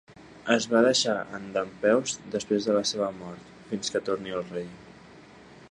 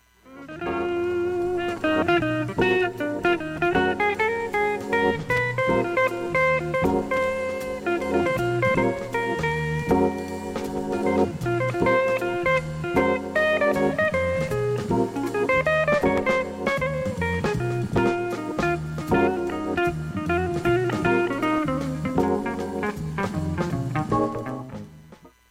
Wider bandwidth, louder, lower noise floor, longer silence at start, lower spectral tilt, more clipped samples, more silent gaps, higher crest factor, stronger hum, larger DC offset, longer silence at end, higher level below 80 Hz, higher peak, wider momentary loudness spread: second, 11 kHz vs 16 kHz; second, -27 LUFS vs -24 LUFS; about the same, -50 dBFS vs -49 dBFS; second, 0.1 s vs 0.25 s; second, -3.5 dB/octave vs -6.5 dB/octave; neither; neither; first, 22 dB vs 16 dB; neither; neither; second, 0.05 s vs 0.2 s; second, -64 dBFS vs -46 dBFS; about the same, -6 dBFS vs -8 dBFS; first, 16 LU vs 7 LU